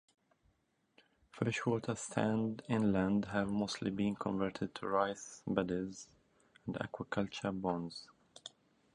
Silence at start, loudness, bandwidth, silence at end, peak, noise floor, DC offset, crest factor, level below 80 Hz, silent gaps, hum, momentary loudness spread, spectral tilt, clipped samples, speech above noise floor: 1.35 s; -37 LUFS; 10.5 kHz; 0.45 s; -16 dBFS; -77 dBFS; under 0.1%; 22 dB; -66 dBFS; none; none; 17 LU; -6 dB/octave; under 0.1%; 41 dB